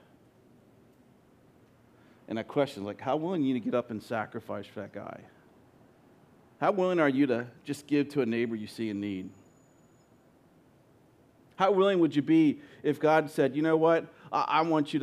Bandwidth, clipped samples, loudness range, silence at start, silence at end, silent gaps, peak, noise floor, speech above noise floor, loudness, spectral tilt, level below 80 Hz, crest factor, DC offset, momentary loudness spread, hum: 13 kHz; under 0.1%; 10 LU; 2.3 s; 0 s; none; -10 dBFS; -61 dBFS; 33 dB; -29 LUFS; -7 dB/octave; -80 dBFS; 20 dB; under 0.1%; 15 LU; none